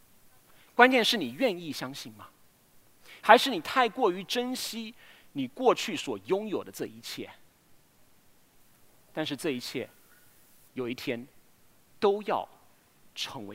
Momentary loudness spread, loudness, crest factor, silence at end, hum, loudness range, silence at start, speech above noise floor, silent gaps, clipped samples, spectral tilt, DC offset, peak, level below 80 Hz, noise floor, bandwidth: 21 LU; -28 LUFS; 30 dB; 0 s; none; 12 LU; 0.75 s; 32 dB; none; under 0.1%; -3.5 dB/octave; under 0.1%; -2 dBFS; -74 dBFS; -61 dBFS; 16 kHz